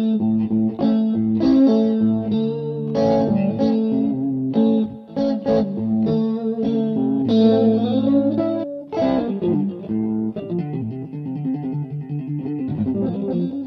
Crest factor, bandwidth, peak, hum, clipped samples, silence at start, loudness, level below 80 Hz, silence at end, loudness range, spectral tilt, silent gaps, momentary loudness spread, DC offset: 14 dB; 6 kHz; -4 dBFS; none; under 0.1%; 0 s; -20 LUFS; -54 dBFS; 0 s; 6 LU; -10 dB/octave; none; 10 LU; under 0.1%